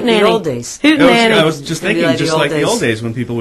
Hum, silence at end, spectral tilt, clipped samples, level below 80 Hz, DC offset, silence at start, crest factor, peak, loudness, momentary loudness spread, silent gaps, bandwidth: none; 0 s; -4.5 dB/octave; under 0.1%; -46 dBFS; under 0.1%; 0 s; 12 dB; 0 dBFS; -13 LUFS; 10 LU; none; 13 kHz